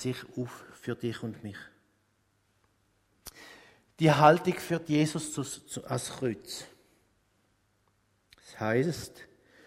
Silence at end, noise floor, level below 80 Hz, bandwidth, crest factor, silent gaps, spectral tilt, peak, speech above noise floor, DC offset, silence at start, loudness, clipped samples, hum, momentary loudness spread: 0.45 s; -72 dBFS; -66 dBFS; 16 kHz; 26 dB; none; -5.5 dB/octave; -6 dBFS; 43 dB; under 0.1%; 0 s; -29 LUFS; under 0.1%; none; 26 LU